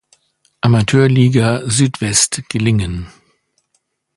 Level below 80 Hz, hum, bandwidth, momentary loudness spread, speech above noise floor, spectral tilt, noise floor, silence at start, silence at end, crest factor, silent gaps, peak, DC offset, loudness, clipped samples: -40 dBFS; none; 11.5 kHz; 9 LU; 53 dB; -5 dB/octave; -66 dBFS; 0.65 s; 1.1 s; 16 dB; none; 0 dBFS; under 0.1%; -14 LUFS; under 0.1%